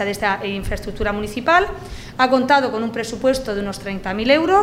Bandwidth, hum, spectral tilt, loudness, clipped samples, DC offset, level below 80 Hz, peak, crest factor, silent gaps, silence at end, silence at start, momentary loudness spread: 16 kHz; none; -4.5 dB/octave; -19 LUFS; under 0.1%; under 0.1%; -36 dBFS; -2 dBFS; 18 dB; none; 0 s; 0 s; 11 LU